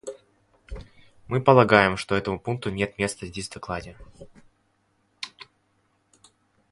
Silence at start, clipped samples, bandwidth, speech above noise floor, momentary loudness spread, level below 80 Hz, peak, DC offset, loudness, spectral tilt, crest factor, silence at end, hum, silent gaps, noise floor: 0.05 s; under 0.1%; 11.5 kHz; 46 dB; 26 LU; -50 dBFS; 0 dBFS; under 0.1%; -23 LUFS; -5.5 dB/octave; 26 dB; 1.45 s; none; none; -69 dBFS